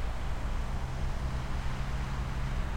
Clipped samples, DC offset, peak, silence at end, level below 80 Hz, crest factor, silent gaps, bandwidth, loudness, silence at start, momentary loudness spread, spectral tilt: under 0.1%; under 0.1%; -20 dBFS; 0 s; -34 dBFS; 12 dB; none; 15 kHz; -37 LUFS; 0 s; 1 LU; -6 dB/octave